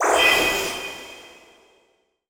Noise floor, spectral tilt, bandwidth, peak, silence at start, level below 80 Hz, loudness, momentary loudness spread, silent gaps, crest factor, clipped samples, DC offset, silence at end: -65 dBFS; -1 dB/octave; over 20 kHz; -4 dBFS; 0 s; -50 dBFS; -19 LUFS; 24 LU; none; 18 dB; under 0.1%; under 0.1%; 1 s